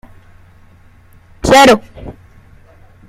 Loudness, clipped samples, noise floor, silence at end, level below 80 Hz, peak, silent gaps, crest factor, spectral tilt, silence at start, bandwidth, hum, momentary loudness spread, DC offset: -9 LUFS; under 0.1%; -43 dBFS; 0.95 s; -36 dBFS; 0 dBFS; none; 16 dB; -3.5 dB/octave; 1.45 s; 16 kHz; none; 27 LU; under 0.1%